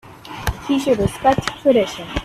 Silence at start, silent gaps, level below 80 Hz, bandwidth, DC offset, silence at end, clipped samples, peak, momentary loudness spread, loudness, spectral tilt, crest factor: 0.05 s; none; -36 dBFS; 15.5 kHz; under 0.1%; 0 s; under 0.1%; -2 dBFS; 10 LU; -19 LUFS; -5.5 dB/octave; 18 dB